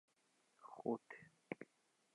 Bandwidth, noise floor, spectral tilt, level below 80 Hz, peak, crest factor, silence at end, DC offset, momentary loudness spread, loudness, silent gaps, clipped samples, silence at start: 11 kHz; -80 dBFS; -7 dB/octave; under -90 dBFS; -28 dBFS; 24 dB; 0.5 s; under 0.1%; 16 LU; -49 LUFS; none; under 0.1%; 0.6 s